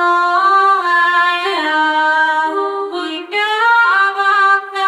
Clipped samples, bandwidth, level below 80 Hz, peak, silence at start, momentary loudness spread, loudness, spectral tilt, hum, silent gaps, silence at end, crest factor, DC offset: under 0.1%; 13 kHz; -76 dBFS; -2 dBFS; 0 s; 9 LU; -13 LUFS; -0.5 dB/octave; none; none; 0 s; 12 dB; under 0.1%